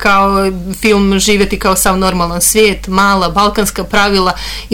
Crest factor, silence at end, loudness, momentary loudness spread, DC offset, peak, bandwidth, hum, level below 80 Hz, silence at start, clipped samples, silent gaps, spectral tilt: 10 dB; 0 s; -11 LUFS; 5 LU; under 0.1%; 0 dBFS; 19 kHz; none; -26 dBFS; 0 s; under 0.1%; none; -3.5 dB/octave